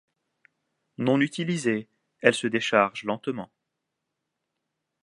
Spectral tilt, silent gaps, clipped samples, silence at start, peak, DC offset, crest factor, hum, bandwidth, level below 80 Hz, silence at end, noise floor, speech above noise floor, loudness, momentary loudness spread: -5 dB/octave; none; under 0.1%; 1 s; -2 dBFS; under 0.1%; 26 dB; none; 11.5 kHz; -74 dBFS; 1.6 s; -82 dBFS; 58 dB; -25 LUFS; 10 LU